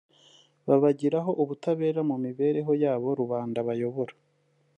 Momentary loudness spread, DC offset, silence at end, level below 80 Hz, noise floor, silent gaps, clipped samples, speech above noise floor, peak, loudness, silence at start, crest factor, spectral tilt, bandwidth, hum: 7 LU; under 0.1%; 0.65 s; -78 dBFS; -68 dBFS; none; under 0.1%; 42 dB; -8 dBFS; -27 LUFS; 0.65 s; 18 dB; -9 dB/octave; 8.8 kHz; none